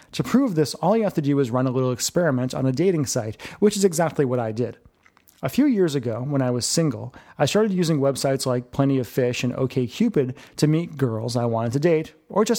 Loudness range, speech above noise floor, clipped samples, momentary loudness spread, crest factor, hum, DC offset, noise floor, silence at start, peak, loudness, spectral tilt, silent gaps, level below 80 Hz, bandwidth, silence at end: 1 LU; 35 dB; under 0.1%; 6 LU; 16 dB; none; under 0.1%; -57 dBFS; 0.15 s; -6 dBFS; -22 LUFS; -5.5 dB/octave; none; -58 dBFS; 17.5 kHz; 0 s